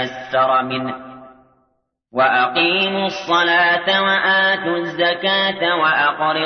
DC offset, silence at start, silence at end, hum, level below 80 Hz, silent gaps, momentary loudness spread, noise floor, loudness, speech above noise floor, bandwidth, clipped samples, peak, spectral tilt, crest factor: under 0.1%; 0 s; 0 s; none; -62 dBFS; none; 8 LU; -67 dBFS; -16 LUFS; 50 dB; 6.6 kHz; under 0.1%; -4 dBFS; -4.5 dB/octave; 14 dB